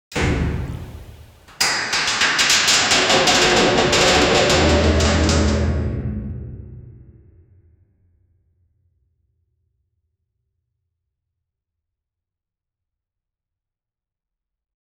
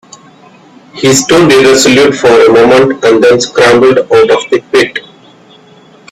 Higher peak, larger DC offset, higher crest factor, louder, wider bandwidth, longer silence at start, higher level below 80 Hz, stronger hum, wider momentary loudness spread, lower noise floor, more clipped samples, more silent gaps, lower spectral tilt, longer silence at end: second, -4 dBFS vs 0 dBFS; neither; first, 18 dB vs 8 dB; second, -16 LUFS vs -6 LUFS; first, 18 kHz vs 15.5 kHz; second, 0.1 s vs 0.95 s; first, -32 dBFS vs -42 dBFS; neither; first, 18 LU vs 6 LU; first, -89 dBFS vs -38 dBFS; second, under 0.1% vs 0.5%; neither; about the same, -3 dB/octave vs -4 dB/octave; first, 8.05 s vs 1.1 s